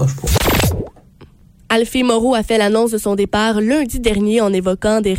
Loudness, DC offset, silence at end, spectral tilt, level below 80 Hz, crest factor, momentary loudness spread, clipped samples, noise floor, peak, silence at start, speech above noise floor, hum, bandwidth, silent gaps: -16 LUFS; under 0.1%; 0 s; -5 dB/octave; -30 dBFS; 14 dB; 3 LU; under 0.1%; -44 dBFS; -2 dBFS; 0 s; 29 dB; none; 16.5 kHz; none